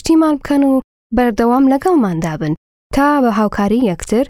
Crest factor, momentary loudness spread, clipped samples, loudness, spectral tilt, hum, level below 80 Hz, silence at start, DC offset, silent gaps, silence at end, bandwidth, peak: 14 dB; 8 LU; under 0.1%; -14 LUFS; -6.5 dB/octave; none; -36 dBFS; 0.05 s; under 0.1%; 0.84-1.10 s, 2.57-2.90 s; 0 s; 15 kHz; 0 dBFS